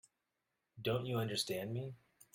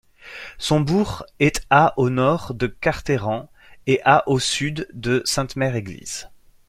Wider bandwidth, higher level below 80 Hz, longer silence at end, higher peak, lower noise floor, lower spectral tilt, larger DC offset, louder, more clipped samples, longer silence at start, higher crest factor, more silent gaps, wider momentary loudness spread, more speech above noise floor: about the same, 17 kHz vs 15.5 kHz; second, -72 dBFS vs -44 dBFS; about the same, 0.4 s vs 0.4 s; second, -22 dBFS vs 0 dBFS; first, -87 dBFS vs -39 dBFS; about the same, -5 dB/octave vs -5 dB/octave; neither; second, -40 LUFS vs -21 LUFS; neither; first, 0.75 s vs 0.25 s; about the same, 20 dB vs 20 dB; neither; second, 11 LU vs 15 LU; first, 49 dB vs 19 dB